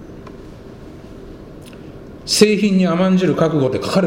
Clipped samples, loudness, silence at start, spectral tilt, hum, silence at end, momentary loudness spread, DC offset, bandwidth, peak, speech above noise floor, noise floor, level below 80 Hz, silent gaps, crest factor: under 0.1%; -15 LUFS; 0 s; -5.5 dB/octave; none; 0 s; 24 LU; under 0.1%; 16 kHz; 0 dBFS; 22 dB; -36 dBFS; -44 dBFS; none; 18 dB